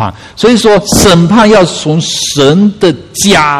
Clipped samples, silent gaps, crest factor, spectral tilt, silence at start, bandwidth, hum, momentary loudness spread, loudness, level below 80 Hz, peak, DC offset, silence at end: 2%; none; 8 dB; -4.5 dB/octave; 0 s; 15.5 kHz; none; 6 LU; -7 LUFS; -30 dBFS; 0 dBFS; 0.7%; 0 s